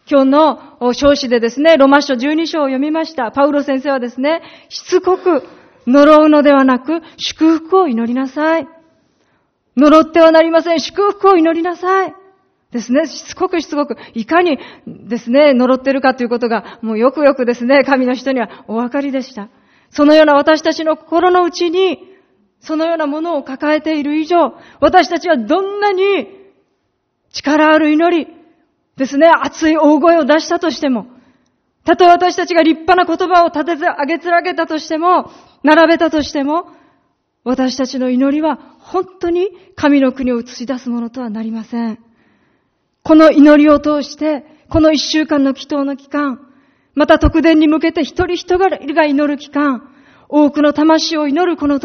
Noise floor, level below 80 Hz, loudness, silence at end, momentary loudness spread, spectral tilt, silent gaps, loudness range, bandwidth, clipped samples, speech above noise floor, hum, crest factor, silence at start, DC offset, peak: -66 dBFS; -40 dBFS; -13 LUFS; 0.05 s; 13 LU; -5 dB/octave; none; 5 LU; 6.6 kHz; 0.2%; 54 dB; none; 14 dB; 0.1 s; under 0.1%; 0 dBFS